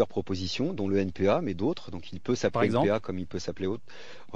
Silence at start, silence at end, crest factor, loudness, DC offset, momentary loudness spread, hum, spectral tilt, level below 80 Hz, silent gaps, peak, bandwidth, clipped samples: 0 s; 0.15 s; 18 dB; -29 LUFS; 1%; 13 LU; none; -6 dB/octave; -60 dBFS; none; -10 dBFS; 9.4 kHz; under 0.1%